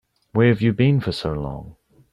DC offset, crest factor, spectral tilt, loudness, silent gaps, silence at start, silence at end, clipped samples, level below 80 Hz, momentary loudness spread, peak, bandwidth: under 0.1%; 16 dB; -8 dB/octave; -20 LUFS; none; 0.35 s; 0.4 s; under 0.1%; -44 dBFS; 13 LU; -6 dBFS; 11 kHz